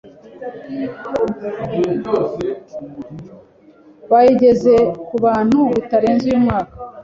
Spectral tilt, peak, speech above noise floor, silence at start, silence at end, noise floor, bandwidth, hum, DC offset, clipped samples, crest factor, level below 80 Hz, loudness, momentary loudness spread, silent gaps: -8 dB/octave; -2 dBFS; 31 dB; 0.05 s; 0 s; -46 dBFS; 7.4 kHz; none; under 0.1%; under 0.1%; 16 dB; -48 dBFS; -16 LUFS; 20 LU; none